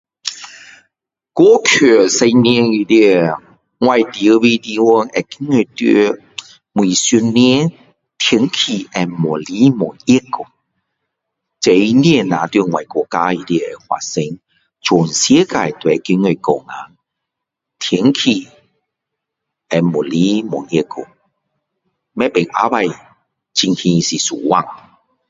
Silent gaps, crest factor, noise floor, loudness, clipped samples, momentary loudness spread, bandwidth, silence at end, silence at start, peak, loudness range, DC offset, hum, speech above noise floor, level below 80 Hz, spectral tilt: none; 14 dB; -80 dBFS; -14 LUFS; under 0.1%; 14 LU; 8 kHz; 0.55 s; 0.25 s; 0 dBFS; 7 LU; under 0.1%; none; 67 dB; -56 dBFS; -4.5 dB/octave